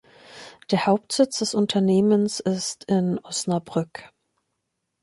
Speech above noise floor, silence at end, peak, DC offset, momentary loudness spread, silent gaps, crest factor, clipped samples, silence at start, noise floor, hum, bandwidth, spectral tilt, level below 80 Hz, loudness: 56 dB; 0.95 s; -6 dBFS; under 0.1%; 17 LU; none; 18 dB; under 0.1%; 0.3 s; -78 dBFS; none; 11.5 kHz; -5 dB/octave; -66 dBFS; -23 LUFS